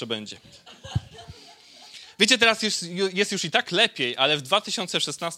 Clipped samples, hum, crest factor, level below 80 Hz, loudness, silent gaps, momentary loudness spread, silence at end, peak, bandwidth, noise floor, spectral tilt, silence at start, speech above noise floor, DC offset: under 0.1%; none; 22 dB; -54 dBFS; -22 LUFS; none; 21 LU; 0 s; -2 dBFS; 16 kHz; -49 dBFS; -2.5 dB/octave; 0 s; 25 dB; under 0.1%